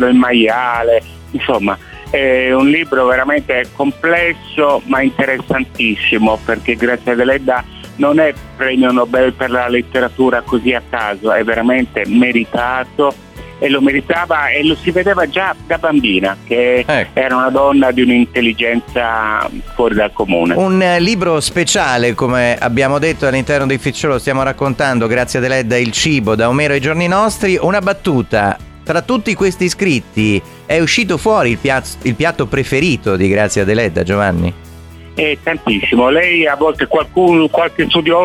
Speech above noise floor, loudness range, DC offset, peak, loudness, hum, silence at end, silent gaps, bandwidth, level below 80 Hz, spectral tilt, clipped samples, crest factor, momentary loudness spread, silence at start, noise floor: 21 dB; 2 LU; under 0.1%; -2 dBFS; -13 LUFS; none; 0 s; none; 16 kHz; -38 dBFS; -5 dB/octave; under 0.1%; 12 dB; 5 LU; 0 s; -34 dBFS